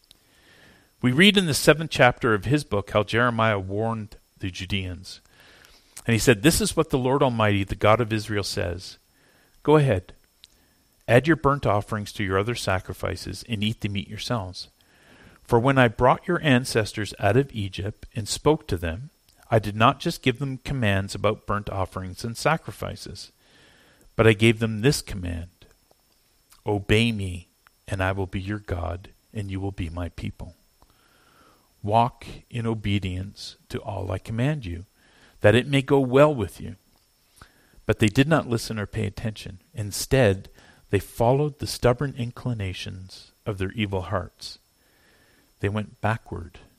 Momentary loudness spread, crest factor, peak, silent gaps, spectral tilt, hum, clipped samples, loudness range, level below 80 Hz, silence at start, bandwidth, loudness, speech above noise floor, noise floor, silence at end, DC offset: 17 LU; 22 dB; -2 dBFS; none; -5.5 dB/octave; none; under 0.1%; 8 LU; -46 dBFS; 1.05 s; 15.5 kHz; -24 LUFS; 40 dB; -63 dBFS; 0.2 s; under 0.1%